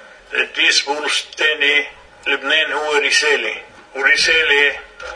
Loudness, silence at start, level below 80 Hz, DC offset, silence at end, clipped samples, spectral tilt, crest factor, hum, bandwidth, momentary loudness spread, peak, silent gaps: -15 LUFS; 0 s; -54 dBFS; under 0.1%; 0 s; under 0.1%; 0.5 dB/octave; 18 dB; none; 10.5 kHz; 13 LU; 0 dBFS; none